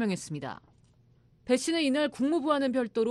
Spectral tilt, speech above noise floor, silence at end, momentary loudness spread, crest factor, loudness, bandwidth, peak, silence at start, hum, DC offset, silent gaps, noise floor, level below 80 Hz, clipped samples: -4.5 dB/octave; 34 dB; 0 s; 14 LU; 18 dB; -29 LUFS; 12.5 kHz; -12 dBFS; 0 s; none; under 0.1%; none; -62 dBFS; -68 dBFS; under 0.1%